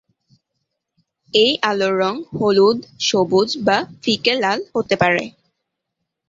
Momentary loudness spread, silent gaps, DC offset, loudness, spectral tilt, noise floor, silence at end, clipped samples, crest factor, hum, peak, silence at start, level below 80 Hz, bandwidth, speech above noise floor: 6 LU; none; under 0.1%; -18 LUFS; -4 dB/octave; -78 dBFS; 1 s; under 0.1%; 18 dB; none; -2 dBFS; 1.35 s; -58 dBFS; 7.8 kHz; 61 dB